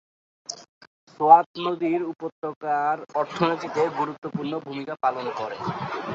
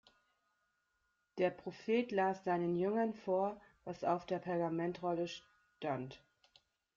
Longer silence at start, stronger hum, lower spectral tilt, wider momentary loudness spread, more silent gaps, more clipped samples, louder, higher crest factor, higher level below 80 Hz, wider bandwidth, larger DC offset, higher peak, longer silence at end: second, 0.5 s vs 1.35 s; neither; second, -5.5 dB/octave vs -7 dB/octave; first, 17 LU vs 11 LU; first, 0.69-0.81 s, 0.87-1.07 s, 1.46-1.54 s, 2.32-2.42 s, 2.56-2.61 s, 4.18-4.22 s vs none; neither; first, -24 LUFS vs -38 LUFS; about the same, 22 dB vs 18 dB; first, -70 dBFS vs -78 dBFS; about the same, 7.8 kHz vs 7.4 kHz; neither; first, -2 dBFS vs -20 dBFS; second, 0 s vs 0.8 s